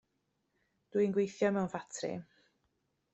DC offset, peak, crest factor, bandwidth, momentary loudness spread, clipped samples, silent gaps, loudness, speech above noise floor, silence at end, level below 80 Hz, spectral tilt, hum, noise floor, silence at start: under 0.1%; -18 dBFS; 18 dB; 8.2 kHz; 9 LU; under 0.1%; none; -34 LUFS; 48 dB; 0.9 s; -76 dBFS; -6 dB/octave; none; -81 dBFS; 0.95 s